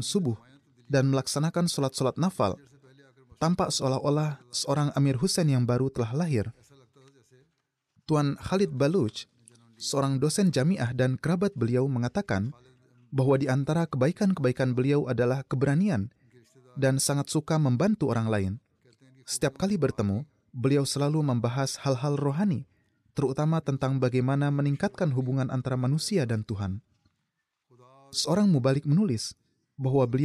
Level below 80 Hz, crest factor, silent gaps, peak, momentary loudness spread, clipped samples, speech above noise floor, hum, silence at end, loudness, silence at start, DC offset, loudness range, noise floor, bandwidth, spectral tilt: -60 dBFS; 14 dB; none; -14 dBFS; 8 LU; under 0.1%; 55 dB; none; 0 s; -27 LUFS; 0 s; under 0.1%; 3 LU; -81 dBFS; 13.5 kHz; -6 dB/octave